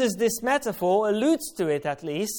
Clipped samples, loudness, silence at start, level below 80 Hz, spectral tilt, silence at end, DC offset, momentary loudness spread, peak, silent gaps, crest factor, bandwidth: under 0.1%; -25 LUFS; 0 s; -62 dBFS; -4 dB/octave; 0 s; under 0.1%; 6 LU; -10 dBFS; none; 14 dB; 18 kHz